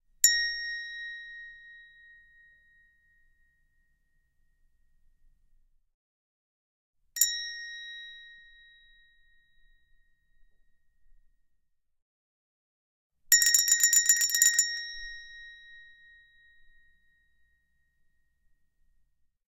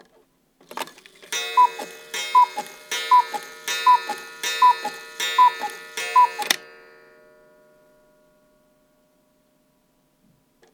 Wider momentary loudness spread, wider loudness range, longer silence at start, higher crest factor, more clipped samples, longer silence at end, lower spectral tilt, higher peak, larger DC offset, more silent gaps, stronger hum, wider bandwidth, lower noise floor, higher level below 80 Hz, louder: first, 25 LU vs 16 LU; first, 22 LU vs 5 LU; second, 0.25 s vs 0.75 s; first, 28 dB vs 22 dB; neither; second, 3.7 s vs 4.15 s; second, 7 dB/octave vs 1 dB/octave; second, -6 dBFS vs -2 dBFS; neither; first, 5.94-6.93 s, 12.02-13.10 s vs none; neither; second, 16 kHz vs over 20 kHz; first, -72 dBFS vs -64 dBFS; first, -66 dBFS vs -76 dBFS; second, -23 LUFS vs -20 LUFS